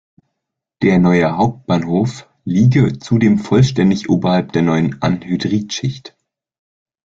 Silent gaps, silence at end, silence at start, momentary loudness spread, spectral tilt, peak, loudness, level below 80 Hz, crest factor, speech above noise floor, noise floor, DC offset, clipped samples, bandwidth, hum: none; 1.05 s; 0.8 s; 9 LU; -7 dB/octave; -2 dBFS; -15 LUFS; -46 dBFS; 14 dB; 64 dB; -78 dBFS; under 0.1%; under 0.1%; 7.8 kHz; none